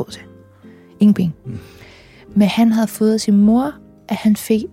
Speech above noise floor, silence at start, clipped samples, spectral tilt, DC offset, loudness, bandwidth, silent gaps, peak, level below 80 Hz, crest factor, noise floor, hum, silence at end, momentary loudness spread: 28 dB; 0 s; under 0.1%; -6.5 dB/octave; under 0.1%; -16 LUFS; 16 kHz; none; -4 dBFS; -50 dBFS; 14 dB; -43 dBFS; none; 0.05 s; 18 LU